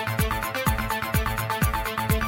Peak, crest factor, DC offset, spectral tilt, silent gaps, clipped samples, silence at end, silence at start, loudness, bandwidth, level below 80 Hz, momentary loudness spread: -10 dBFS; 16 dB; under 0.1%; -4.5 dB/octave; none; under 0.1%; 0 s; 0 s; -25 LUFS; 17 kHz; -32 dBFS; 2 LU